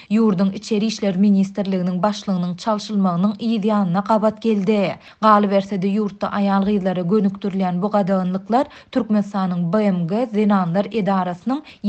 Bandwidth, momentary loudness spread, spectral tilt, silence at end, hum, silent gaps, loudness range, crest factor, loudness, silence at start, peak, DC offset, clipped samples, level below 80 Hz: 8.4 kHz; 6 LU; -7.5 dB/octave; 0 s; none; none; 2 LU; 18 dB; -19 LUFS; 0 s; 0 dBFS; under 0.1%; under 0.1%; -58 dBFS